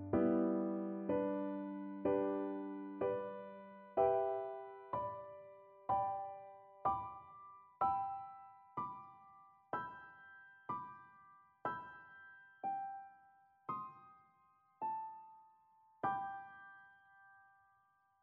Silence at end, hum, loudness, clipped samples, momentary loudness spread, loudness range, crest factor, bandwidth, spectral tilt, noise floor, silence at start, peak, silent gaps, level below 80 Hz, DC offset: 0.85 s; none; -41 LUFS; under 0.1%; 21 LU; 9 LU; 22 dB; 4.2 kHz; -7 dB/octave; -75 dBFS; 0 s; -22 dBFS; none; -74 dBFS; under 0.1%